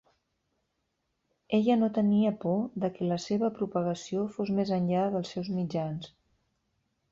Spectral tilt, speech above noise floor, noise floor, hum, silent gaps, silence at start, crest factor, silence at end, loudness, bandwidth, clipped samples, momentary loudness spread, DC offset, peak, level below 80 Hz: -7.5 dB/octave; 51 dB; -79 dBFS; none; none; 1.5 s; 16 dB; 1.05 s; -29 LUFS; 7.6 kHz; under 0.1%; 8 LU; under 0.1%; -14 dBFS; -68 dBFS